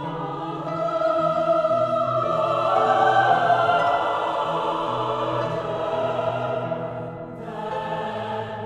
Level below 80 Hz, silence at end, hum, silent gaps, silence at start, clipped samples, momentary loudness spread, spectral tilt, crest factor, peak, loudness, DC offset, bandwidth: -58 dBFS; 0 s; none; none; 0 s; under 0.1%; 11 LU; -6 dB/octave; 16 dB; -6 dBFS; -23 LUFS; under 0.1%; 10 kHz